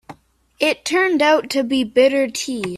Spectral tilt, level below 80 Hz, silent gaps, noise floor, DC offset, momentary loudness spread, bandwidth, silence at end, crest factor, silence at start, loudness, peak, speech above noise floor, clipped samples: -3 dB/octave; -58 dBFS; none; -48 dBFS; under 0.1%; 6 LU; 14 kHz; 0 s; 16 dB; 0.1 s; -17 LUFS; -4 dBFS; 30 dB; under 0.1%